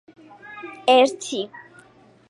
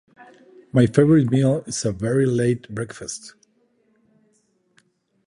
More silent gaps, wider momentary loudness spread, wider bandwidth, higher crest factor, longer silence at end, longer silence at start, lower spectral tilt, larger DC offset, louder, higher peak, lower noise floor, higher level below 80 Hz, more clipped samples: neither; first, 22 LU vs 16 LU; about the same, 11.5 kHz vs 11 kHz; about the same, 18 dB vs 20 dB; second, 0.85 s vs 2 s; first, 0.5 s vs 0.2 s; second, -2.5 dB/octave vs -6.5 dB/octave; neither; about the same, -20 LUFS vs -20 LUFS; second, -6 dBFS vs -2 dBFS; second, -52 dBFS vs -65 dBFS; second, -76 dBFS vs -54 dBFS; neither